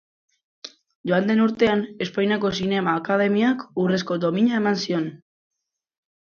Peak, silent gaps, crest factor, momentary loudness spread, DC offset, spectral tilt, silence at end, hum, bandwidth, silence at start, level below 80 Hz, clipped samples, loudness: -6 dBFS; 0.95-1.04 s; 18 dB; 14 LU; under 0.1%; -6 dB/octave; 1.15 s; none; 7 kHz; 0.65 s; -62 dBFS; under 0.1%; -22 LUFS